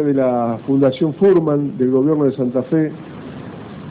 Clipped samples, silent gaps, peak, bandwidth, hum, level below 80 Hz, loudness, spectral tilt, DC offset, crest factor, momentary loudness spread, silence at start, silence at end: under 0.1%; none; -6 dBFS; 4.8 kHz; none; -56 dBFS; -17 LUFS; -11.5 dB/octave; under 0.1%; 12 dB; 19 LU; 0 s; 0 s